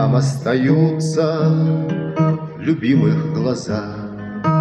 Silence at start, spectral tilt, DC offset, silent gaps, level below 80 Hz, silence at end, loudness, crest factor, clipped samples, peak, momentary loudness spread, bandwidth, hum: 0 s; -7.5 dB/octave; under 0.1%; none; -54 dBFS; 0 s; -18 LUFS; 14 dB; under 0.1%; -4 dBFS; 9 LU; 9.4 kHz; none